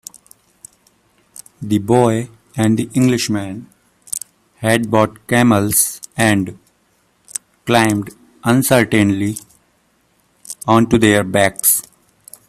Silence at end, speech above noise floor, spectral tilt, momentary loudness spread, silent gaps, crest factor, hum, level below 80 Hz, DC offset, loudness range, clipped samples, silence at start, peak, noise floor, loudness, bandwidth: 0.7 s; 45 dB; -4.5 dB/octave; 16 LU; none; 18 dB; none; -50 dBFS; under 0.1%; 2 LU; under 0.1%; 1.6 s; 0 dBFS; -59 dBFS; -15 LUFS; 16 kHz